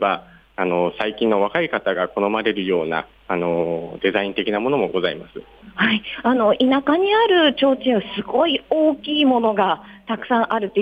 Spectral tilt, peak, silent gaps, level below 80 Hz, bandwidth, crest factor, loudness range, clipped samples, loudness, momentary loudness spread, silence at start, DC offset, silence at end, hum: -7 dB/octave; -6 dBFS; none; -56 dBFS; 5 kHz; 14 dB; 4 LU; under 0.1%; -19 LUFS; 10 LU; 0 s; under 0.1%; 0 s; none